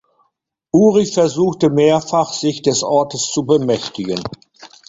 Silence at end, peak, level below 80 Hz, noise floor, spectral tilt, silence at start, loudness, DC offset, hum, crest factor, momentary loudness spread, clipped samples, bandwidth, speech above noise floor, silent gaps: 0.2 s; 0 dBFS; -54 dBFS; -69 dBFS; -5 dB/octave; 0.75 s; -16 LUFS; under 0.1%; none; 16 dB; 10 LU; under 0.1%; 8 kHz; 54 dB; none